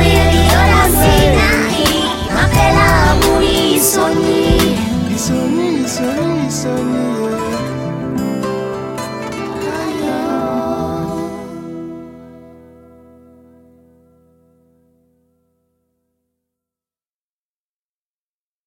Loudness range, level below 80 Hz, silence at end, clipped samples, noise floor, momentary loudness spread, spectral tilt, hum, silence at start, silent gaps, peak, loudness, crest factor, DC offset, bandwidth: 14 LU; -24 dBFS; 6.2 s; under 0.1%; under -90 dBFS; 13 LU; -4.5 dB/octave; none; 0 s; none; 0 dBFS; -14 LUFS; 16 dB; under 0.1%; 17 kHz